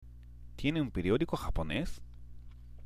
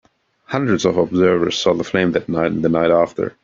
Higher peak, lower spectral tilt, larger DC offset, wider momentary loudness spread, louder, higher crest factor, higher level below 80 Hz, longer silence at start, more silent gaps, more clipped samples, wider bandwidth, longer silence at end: second, -18 dBFS vs 0 dBFS; about the same, -6.5 dB/octave vs -5.5 dB/octave; neither; first, 23 LU vs 5 LU; second, -34 LUFS vs -17 LUFS; about the same, 18 dB vs 16 dB; first, -44 dBFS vs -52 dBFS; second, 0 s vs 0.5 s; neither; neither; first, 15.5 kHz vs 7.6 kHz; second, 0 s vs 0.15 s